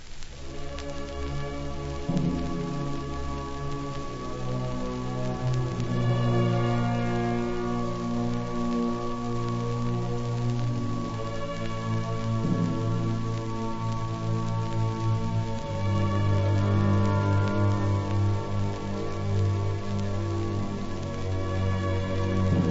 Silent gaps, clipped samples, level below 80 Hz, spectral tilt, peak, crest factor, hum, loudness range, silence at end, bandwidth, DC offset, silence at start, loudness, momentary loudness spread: none; under 0.1%; -38 dBFS; -7.5 dB/octave; -12 dBFS; 14 dB; none; 6 LU; 0 s; 8 kHz; under 0.1%; 0 s; -29 LUFS; 9 LU